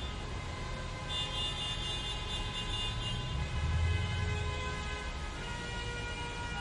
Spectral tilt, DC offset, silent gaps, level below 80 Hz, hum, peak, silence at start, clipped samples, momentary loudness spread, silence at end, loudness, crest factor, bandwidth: -4 dB/octave; under 0.1%; none; -42 dBFS; none; -22 dBFS; 0 s; under 0.1%; 7 LU; 0 s; -36 LUFS; 14 dB; 11.5 kHz